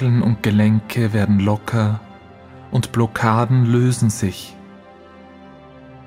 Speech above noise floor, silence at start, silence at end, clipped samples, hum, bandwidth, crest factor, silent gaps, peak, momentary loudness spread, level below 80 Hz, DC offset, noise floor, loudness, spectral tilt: 26 dB; 0 s; 0 s; under 0.1%; none; 15.5 kHz; 18 dB; none; 0 dBFS; 8 LU; -50 dBFS; under 0.1%; -42 dBFS; -18 LUFS; -7 dB/octave